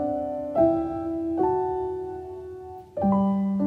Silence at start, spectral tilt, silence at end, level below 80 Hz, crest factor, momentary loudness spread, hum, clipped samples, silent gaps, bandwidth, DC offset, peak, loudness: 0 s; -11 dB/octave; 0 s; -54 dBFS; 16 dB; 15 LU; none; under 0.1%; none; 4.3 kHz; under 0.1%; -10 dBFS; -25 LUFS